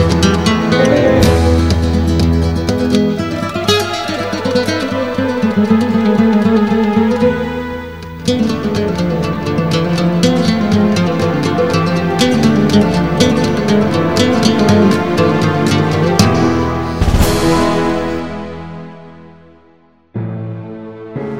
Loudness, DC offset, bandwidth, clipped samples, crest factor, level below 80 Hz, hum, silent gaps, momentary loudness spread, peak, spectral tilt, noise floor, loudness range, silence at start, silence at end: -13 LUFS; 1%; 16 kHz; under 0.1%; 14 dB; -28 dBFS; none; none; 12 LU; 0 dBFS; -6 dB/octave; -49 dBFS; 4 LU; 0 s; 0 s